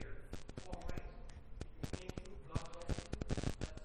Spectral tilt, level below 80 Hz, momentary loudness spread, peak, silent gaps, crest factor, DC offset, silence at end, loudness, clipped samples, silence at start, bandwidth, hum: -5.5 dB/octave; -50 dBFS; 12 LU; -24 dBFS; none; 20 dB; under 0.1%; 0 s; -47 LUFS; under 0.1%; 0 s; 14.5 kHz; none